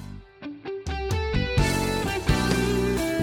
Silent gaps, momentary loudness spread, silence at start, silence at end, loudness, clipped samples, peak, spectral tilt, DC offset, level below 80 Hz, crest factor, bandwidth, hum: none; 15 LU; 0 s; 0 s; -25 LUFS; under 0.1%; -8 dBFS; -5.5 dB/octave; under 0.1%; -34 dBFS; 16 dB; 19 kHz; none